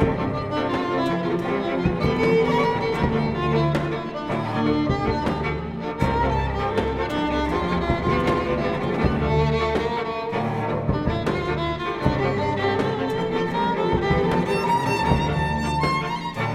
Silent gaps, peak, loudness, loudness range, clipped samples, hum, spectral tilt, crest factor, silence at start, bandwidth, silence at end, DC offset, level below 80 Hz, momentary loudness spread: none; -2 dBFS; -23 LUFS; 2 LU; under 0.1%; none; -7 dB/octave; 20 dB; 0 s; 14 kHz; 0 s; under 0.1%; -36 dBFS; 4 LU